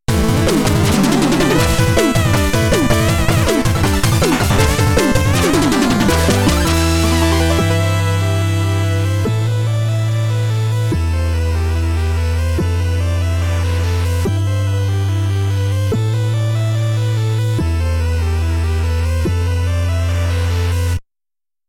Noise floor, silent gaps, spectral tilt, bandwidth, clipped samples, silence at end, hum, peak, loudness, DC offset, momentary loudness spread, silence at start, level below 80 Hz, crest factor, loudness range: under -90 dBFS; none; -5.5 dB/octave; 17 kHz; under 0.1%; 0.7 s; none; 0 dBFS; -16 LUFS; under 0.1%; 4 LU; 0.1 s; -24 dBFS; 14 dB; 4 LU